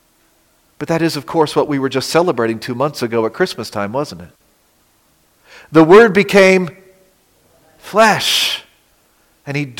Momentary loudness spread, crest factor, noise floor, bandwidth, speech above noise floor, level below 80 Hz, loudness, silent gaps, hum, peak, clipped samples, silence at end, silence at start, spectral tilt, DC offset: 15 LU; 16 dB; -56 dBFS; 17 kHz; 43 dB; -54 dBFS; -14 LUFS; none; none; 0 dBFS; under 0.1%; 0.05 s; 0.8 s; -4.5 dB/octave; under 0.1%